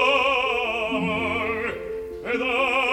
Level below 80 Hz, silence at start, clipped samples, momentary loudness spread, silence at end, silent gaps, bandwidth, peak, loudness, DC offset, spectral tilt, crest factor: -50 dBFS; 0 s; under 0.1%; 11 LU; 0 s; none; 16.5 kHz; -6 dBFS; -23 LUFS; under 0.1%; -4.5 dB/octave; 16 dB